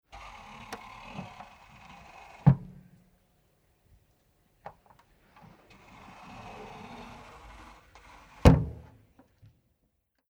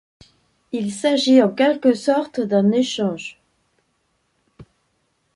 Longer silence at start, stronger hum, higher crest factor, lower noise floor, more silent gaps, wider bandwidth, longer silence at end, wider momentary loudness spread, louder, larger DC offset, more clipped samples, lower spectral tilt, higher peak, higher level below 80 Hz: about the same, 0.7 s vs 0.75 s; neither; first, 28 dB vs 18 dB; first, -76 dBFS vs -68 dBFS; neither; first, 16 kHz vs 11.5 kHz; first, 1.6 s vs 0.75 s; first, 28 LU vs 13 LU; second, -27 LUFS vs -18 LUFS; neither; neither; first, -8 dB/octave vs -5.5 dB/octave; about the same, -4 dBFS vs -2 dBFS; first, -42 dBFS vs -64 dBFS